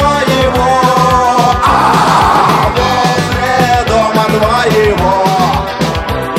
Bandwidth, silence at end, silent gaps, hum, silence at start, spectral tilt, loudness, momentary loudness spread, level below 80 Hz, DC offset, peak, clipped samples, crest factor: 16.5 kHz; 0 s; none; none; 0 s; -5 dB/octave; -10 LUFS; 4 LU; -26 dBFS; under 0.1%; 0 dBFS; under 0.1%; 10 dB